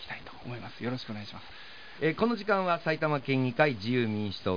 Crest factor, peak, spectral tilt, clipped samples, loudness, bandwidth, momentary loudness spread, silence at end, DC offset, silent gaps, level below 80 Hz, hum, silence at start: 20 dB; -10 dBFS; -7.5 dB/octave; under 0.1%; -29 LUFS; 5.2 kHz; 17 LU; 0 s; 0.4%; none; -66 dBFS; none; 0 s